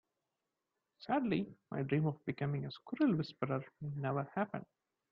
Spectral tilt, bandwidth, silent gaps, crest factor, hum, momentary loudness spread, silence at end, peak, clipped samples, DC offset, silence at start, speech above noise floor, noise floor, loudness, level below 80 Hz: -9.5 dB/octave; 5.6 kHz; none; 18 dB; none; 10 LU; 0.5 s; -20 dBFS; under 0.1%; under 0.1%; 1 s; 52 dB; -89 dBFS; -38 LUFS; -74 dBFS